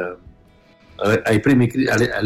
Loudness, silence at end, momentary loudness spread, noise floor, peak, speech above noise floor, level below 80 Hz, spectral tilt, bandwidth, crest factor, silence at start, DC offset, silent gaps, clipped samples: -17 LUFS; 0 s; 8 LU; -51 dBFS; -6 dBFS; 34 dB; -48 dBFS; -6.5 dB/octave; 15 kHz; 14 dB; 0 s; under 0.1%; none; under 0.1%